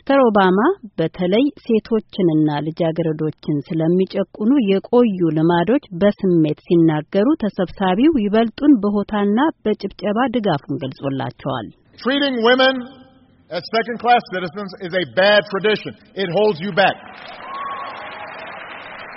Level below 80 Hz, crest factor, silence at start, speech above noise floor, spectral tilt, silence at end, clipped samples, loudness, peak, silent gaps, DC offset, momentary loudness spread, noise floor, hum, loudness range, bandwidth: -52 dBFS; 16 dB; 0.05 s; 32 dB; -4.5 dB/octave; 0 s; under 0.1%; -18 LUFS; -2 dBFS; none; under 0.1%; 14 LU; -49 dBFS; none; 4 LU; 6 kHz